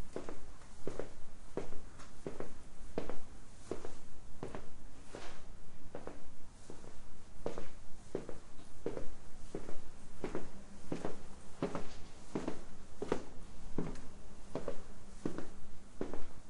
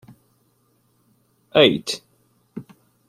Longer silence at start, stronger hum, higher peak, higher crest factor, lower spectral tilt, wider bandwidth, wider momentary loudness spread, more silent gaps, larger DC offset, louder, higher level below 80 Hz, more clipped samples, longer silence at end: second, 0 s vs 1.55 s; neither; second, -20 dBFS vs -2 dBFS; second, 12 dB vs 24 dB; first, -6 dB/octave vs -4 dB/octave; second, 10.5 kHz vs 15.5 kHz; second, 14 LU vs 24 LU; neither; neither; second, -48 LUFS vs -19 LUFS; first, -50 dBFS vs -64 dBFS; neither; second, 0 s vs 0.45 s